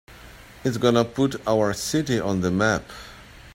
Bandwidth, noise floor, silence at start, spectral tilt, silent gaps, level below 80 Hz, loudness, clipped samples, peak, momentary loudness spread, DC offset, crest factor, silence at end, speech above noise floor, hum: 16.5 kHz; -45 dBFS; 0.1 s; -5.5 dB/octave; none; -50 dBFS; -23 LUFS; under 0.1%; -4 dBFS; 12 LU; under 0.1%; 20 dB; 0.05 s; 23 dB; none